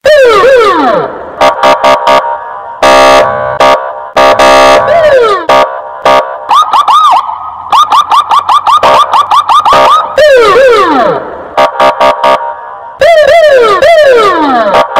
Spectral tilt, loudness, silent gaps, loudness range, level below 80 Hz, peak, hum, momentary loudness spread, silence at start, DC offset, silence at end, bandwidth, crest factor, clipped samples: -3 dB/octave; -5 LUFS; none; 2 LU; -38 dBFS; 0 dBFS; none; 8 LU; 0.05 s; under 0.1%; 0 s; 16.5 kHz; 4 dB; 8%